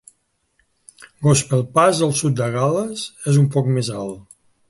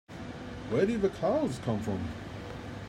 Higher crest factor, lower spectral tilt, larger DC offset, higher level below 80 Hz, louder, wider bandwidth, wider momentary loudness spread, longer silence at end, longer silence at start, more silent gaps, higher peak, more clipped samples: about the same, 18 dB vs 18 dB; second, -5.5 dB/octave vs -7 dB/octave; neither; about the same, -54 dBFS vs -54 dBFS; first, -19 LUFS vs -32 LUFS; second, 11.5 kHz vs 13 kHz; about the same, 11 LU vs 13 LU; first, 0.5 s vs 0 s; first, 1 s vs 0.1 s; neither; first, -2 dBFS vs -14 dBFS; neither